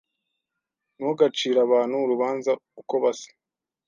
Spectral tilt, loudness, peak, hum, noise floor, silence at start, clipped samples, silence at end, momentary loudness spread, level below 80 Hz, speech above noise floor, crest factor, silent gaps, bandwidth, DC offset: -4.5 dB/octave; -24 LUFS; -6 dBFS; none; -89 dBFS; 1 s; under 0.1%; 0.6 s; 9 LU; -82 dBFS; 66 dB; 18 dB; none; 7.4 kHz; under 0.1%